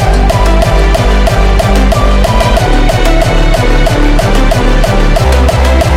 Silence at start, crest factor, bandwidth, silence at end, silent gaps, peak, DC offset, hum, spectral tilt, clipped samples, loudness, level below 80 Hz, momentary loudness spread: 0 s; 6 dB; 15.5 kHz; 0 s; none; 0 dBFS; under 0.1%; none; -5.5 dB/octave; under 0.1%; -9 LUFS; -8 dBFS; 1 LU